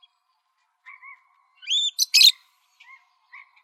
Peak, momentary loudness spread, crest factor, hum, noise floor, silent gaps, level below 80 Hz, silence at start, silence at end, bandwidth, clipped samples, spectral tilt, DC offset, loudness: -6 dBFS; 27 LU; 20 dB; none; -72 dBFS; none; under -90 dBFS; 1.65 s; 1.3 s; 16 kHz; under 0.1%; 13.5 dB/octave; under 0.1%; -16 LUFS